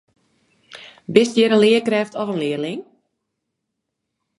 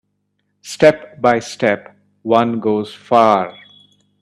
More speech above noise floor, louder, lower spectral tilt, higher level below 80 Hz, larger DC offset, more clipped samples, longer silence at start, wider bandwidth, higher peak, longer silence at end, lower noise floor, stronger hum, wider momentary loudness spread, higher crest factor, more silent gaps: first, 61 dB vs 54 dB; about the same, -18 LUFS vs -16 LUFS; about the same, -5 dB/octave vs -5.5 dB/octave; second, -70 dBFS vs -58 dBFS; neither; neither; about the same, 0.7 s vs 0.65 s; second, 11.5 kHz vs 13 kHz; about the same, 0 dBFS vs 0 dBFS; first, 1.55 s vs 0.7 s; first, -78 dBFS vs -68 dBFS; second, none vs 50 Hz at -50 dBFS; first, 21 LU vs 12 LU; about the same, 20 dB vs 18 dB; neither